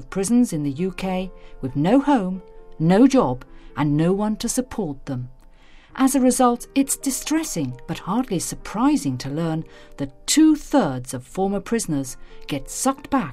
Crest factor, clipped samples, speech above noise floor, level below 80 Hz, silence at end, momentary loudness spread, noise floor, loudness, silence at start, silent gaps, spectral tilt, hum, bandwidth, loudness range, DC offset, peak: 18 dB; under 0.1%; 25 dB; -42 dBFS; 0 s; 15 LU; -46 dBFS; -21 LUFS; 0 s; none; -5 dB/octave; none; 16 kHz; 3 LU; under 0.1%; -4 dBFS